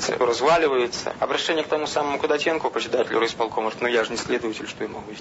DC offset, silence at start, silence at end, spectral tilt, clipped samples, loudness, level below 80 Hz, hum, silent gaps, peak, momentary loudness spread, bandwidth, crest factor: under 0.1%; 0 s; 0 s; -3 dB/octave; under 0.1%; -23 LUFS; -58 dBFS; none; none; -8 dBFS; 8 LU; 8 kHz; 16 dB